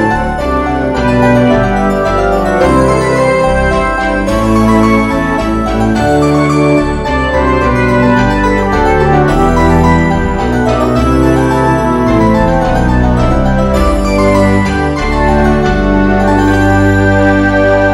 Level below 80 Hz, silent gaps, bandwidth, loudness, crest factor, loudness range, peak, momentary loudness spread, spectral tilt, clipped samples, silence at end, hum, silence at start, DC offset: -18 dBFS; none; 15 kHz; -10 LUFS; 10 dB; 1 LU; 0 dBFS; 4 LU; -7 dB/octave; 0.5%; 0 s; none; 0 s; under 0.1%